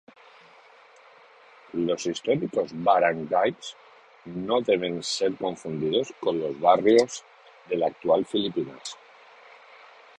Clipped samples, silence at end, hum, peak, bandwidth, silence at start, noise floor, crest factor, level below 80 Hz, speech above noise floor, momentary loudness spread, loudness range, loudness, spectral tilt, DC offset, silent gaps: under 0.1%; 1.25 s; none; -6 dBFS; 10.5 kHz; 1.75 s; -53 dBFS; 22 dB; -68 dBFS; 29 dB; 15 LU; 3 LU; -25 LUFS; -4.5 dB/octave; under 0.1%; none